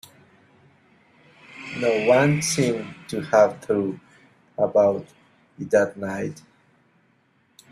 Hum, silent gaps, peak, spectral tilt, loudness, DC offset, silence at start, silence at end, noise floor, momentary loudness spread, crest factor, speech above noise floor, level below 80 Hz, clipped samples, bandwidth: none; none; -4 dBFS; -5 dB/octave; -22 LUFS; under 0.1%; 1.55 s; 1.3 s; -63 dBFS; 16 LU; 20 dB; 42 dB; -64 dBFS; under 0.1%; 13.5 kHz